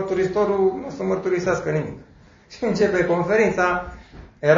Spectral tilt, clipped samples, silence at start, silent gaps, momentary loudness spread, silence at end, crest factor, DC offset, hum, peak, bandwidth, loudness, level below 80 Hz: -6.5 dB/octave; under 0.1%; 0 s; none; 9 LU; 0 s; 18 dB; under 0.1%; none; -4 dBFS; 7.6 kHz; -21 LUFS; -48 dBFS